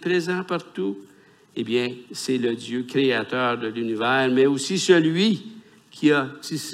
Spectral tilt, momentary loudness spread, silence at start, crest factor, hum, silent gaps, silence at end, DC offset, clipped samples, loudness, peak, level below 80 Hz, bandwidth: -4.5 dB/octave; 12 LU; 0 s; 18 dB; none; none; 0 s; under 0.1%; under 0.1%; -23 LUFS; -4 dBFS; -74 dBFS; 15 kHz